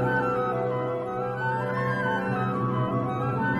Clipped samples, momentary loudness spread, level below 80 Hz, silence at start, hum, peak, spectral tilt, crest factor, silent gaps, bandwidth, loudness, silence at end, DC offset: under 0.1%; 3 LU; -56 dBFS; 0 s; none; -14 dBFS; -8.5 dB/octave; 14 dB; none; 11.5 kHz; -27 LUFS; 0 s; under 0.1%